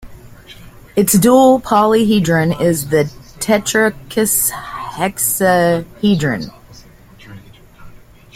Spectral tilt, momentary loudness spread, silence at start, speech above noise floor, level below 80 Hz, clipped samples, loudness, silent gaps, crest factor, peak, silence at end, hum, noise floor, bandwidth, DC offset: -4.5 dB/octave; 12 LU; 0 s; 27 dB; -44 dBFS; under 0.1%; -14 LUFS; none; 14 dB; 0 dBFS; 0.4 s; none; -41 dBFS; 16.5 kHz; under 0.1%